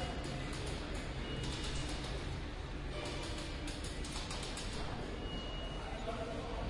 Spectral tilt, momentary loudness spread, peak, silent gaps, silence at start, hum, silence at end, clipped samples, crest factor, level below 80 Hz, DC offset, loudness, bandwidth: -4.5 dB/octave; 3 LU; -28 dBFS; none; 0 s; none; 0 s; under 0.1%; 14 dB; -46 dBFS; under 0.1%; -42 LUFS; 11.5 kHz